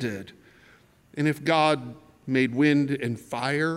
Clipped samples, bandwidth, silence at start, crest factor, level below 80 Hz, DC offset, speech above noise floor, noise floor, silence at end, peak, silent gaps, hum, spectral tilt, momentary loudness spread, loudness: under 0.1%; 14 kHz; 0 s; 18 dB; -68 dBFS; under 0.1%; 32 dB; -57 dBFS; 0 s; -8 dBFS; none; none; -6 dB/octave; 18 LU; -25 LUFS